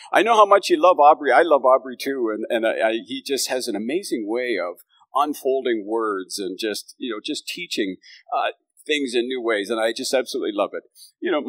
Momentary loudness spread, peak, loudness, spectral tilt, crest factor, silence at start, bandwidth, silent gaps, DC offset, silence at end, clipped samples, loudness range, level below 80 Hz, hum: 13 LU; -2 dBFS; -21 LUFS; -2.5 dB/octave; 18 dB; 0 s; 16 kHz; none; under 0.1%; 0 s; under 0.1%; 8 LU; under -90 dBFS; none